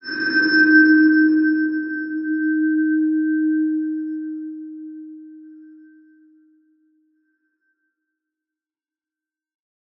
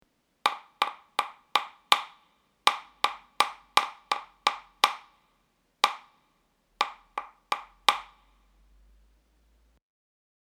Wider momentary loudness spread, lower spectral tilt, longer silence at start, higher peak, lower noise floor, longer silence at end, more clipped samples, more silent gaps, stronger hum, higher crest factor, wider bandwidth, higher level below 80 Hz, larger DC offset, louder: first, 22 LU vs 9 LU; first, -6 dB/octave vs 1 dB/octave; second, 0.05 s vs 0.45 s; second, -4 dBFS vs 0 dBFS; first, under -90 dBFS vs -71 dBFS; first, 4.35 s vs 2.45 s; neither; neither; neither; second, 18 dB vs 32 dB; second, 5.8 kHz vs over 20 kHz; second, -82 dBFS vs -70 dBFS; neither; first, -17 LUFS vs -29 LUFS